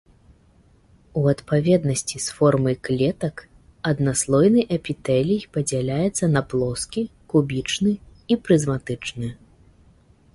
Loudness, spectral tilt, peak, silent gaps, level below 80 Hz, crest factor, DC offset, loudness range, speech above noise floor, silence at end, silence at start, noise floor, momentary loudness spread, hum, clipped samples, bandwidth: -22 LUFS; -5.5 dB/octave; -4 dBFS; none; -50 dBFS; 18 dB; under 0.1%; 3 LU; 35 dB; 1 s; 1.15 s; -56 dBFS; 11 LU; none; under 0.1%; 11.5 kHz